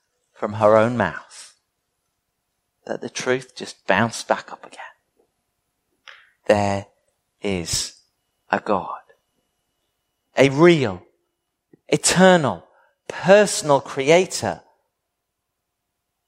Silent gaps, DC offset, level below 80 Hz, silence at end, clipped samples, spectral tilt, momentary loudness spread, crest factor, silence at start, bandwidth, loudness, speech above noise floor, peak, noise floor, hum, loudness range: none; under 0.1%; -56 dBFS; 1.7 s; under 0.1%; -4.5 dB/octave; 21 LU; 22 dB; 0.4 s; 16 kHz; -19 LUFS; 59 dB; 0 dBFS; -78 dBFS; none; 9 LU